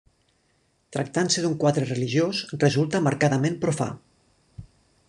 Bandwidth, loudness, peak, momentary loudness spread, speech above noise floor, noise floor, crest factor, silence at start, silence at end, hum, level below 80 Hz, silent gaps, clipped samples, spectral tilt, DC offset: 11 kHz; -24 LUFS; -6 dBFS; 9 LU; 44 dB; -67 dBFS; 20 dB; 0.9 s; 0.45 s; none; -60 dBFS; none; under 0.1%; -5 dB/octave; under 0.1%